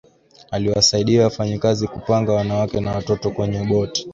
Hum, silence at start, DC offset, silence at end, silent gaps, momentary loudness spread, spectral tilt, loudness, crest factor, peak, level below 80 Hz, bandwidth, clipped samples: none; 0.5 s; under 0.1%; 0 s; none; 8 LU; -5 dB/octave; -19 LUFS; 16 dB; -4 dBFS; -44 dBFS; 7.8 kHz; under 0.1%